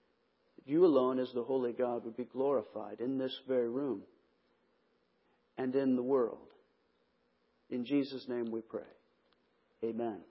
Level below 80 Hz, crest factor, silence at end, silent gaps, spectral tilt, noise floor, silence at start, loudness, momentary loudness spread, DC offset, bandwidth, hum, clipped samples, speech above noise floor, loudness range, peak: -84 dBFS; 20 dB; 0.05 s; none; -5.5 dB/octave; -76 dBFS; 0.65 s; -35 LUFS; 13 LU; under 0.1%; 5.6 kHz; none; under 0.1%; 42 dB; 7 LU; -16 dBFS